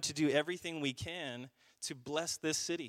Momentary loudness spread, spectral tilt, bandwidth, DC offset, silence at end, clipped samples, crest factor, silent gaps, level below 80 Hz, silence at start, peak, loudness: 12 LU; -3 dB/octave; 16 kHz; under 0.1%; 0 s; under 0.1%; 20 dB; none; -72 dBFS; 0 s; -16 dBFS; -37 LUFS